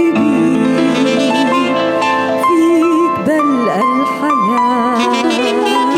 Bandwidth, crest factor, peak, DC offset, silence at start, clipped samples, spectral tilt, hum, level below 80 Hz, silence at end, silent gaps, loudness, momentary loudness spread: 15 kHz; 10 dB; -4 dBFS; under 0.1%; 0 s; under 0.1%; -5 dB/octave; none; -60 dBFS; 0 s; none; -13 LUFS; 2 LU